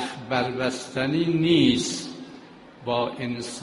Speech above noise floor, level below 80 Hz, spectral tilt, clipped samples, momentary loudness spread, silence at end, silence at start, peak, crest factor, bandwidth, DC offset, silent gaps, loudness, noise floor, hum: 22 dB; -58 dBFS; -5 dB/octave; under 0.1%; 18 LU; 0 s; 0 s; -8 dBFS; 18 dB; 11.5 kHz; under 0.1%; none; -24 LUFS; -46 dBFS; none